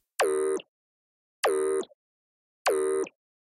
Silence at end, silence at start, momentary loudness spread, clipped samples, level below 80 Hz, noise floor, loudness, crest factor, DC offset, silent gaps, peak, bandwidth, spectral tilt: 0.45 s; 0.2 s; 8 LU; under 0.1%; -72 dBFS; under -90 dBFS; -29 LUFS; 16 dB; under 0.1%; 0.68-1.43 s, 1.94-2.65 s; -14 dBFS; 15.5 kHz; -1.5 dB/octave